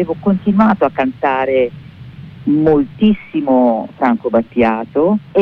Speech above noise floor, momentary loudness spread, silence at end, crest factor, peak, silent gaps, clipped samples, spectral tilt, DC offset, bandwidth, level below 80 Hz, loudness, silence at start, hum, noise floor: 20 dB; 6 LU; 0 s; 12 dB; -2 dBFS; none; under 0.1%; -9.5 dB/octave; under 0.1%; 4.9 kHz; -46 dBFS; -15 LUFS; 0 s; none; -34 dBFS